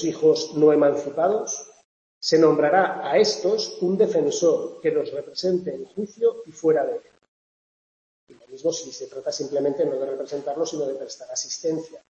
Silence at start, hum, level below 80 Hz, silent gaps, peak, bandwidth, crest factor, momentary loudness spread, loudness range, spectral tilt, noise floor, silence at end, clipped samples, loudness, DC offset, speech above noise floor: 0 s; none; -72 dBFS; 1.85-2.21 s, 7.28-8.27 s; -6 dBFS; 8 kHz; 18 dB; 12 LU; 8 LU; -4 dB/octave; under -90 dBFS; 0.15 s; under 0.1%; -23 LUFS; under 0.1%; over 67 dB